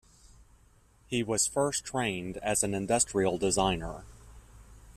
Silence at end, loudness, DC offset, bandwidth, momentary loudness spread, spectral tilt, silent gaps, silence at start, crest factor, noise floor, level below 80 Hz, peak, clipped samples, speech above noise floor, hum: 0.05 s; -29 LUFS; under 0.1%; 14.5 kHz; 8 LU; -3.5 dB/octave; none; 0.4 s; 20 dB; -62 dBFS; -52 dBFS; -12 dBFS; under 0.1%; 32 dB; none